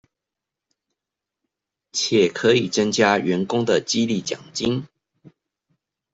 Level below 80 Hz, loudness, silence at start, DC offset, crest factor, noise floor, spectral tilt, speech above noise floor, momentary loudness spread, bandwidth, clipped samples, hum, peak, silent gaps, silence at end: -60 dBFS; -21 LUFS; 1.95 s; under 0.1%; 20 dB; -86 dBFS; -4 dB/octave; 66 dB; 8 LU; 8 kHz; under 0.1%; none; -4 dBFS; none; 1.3 s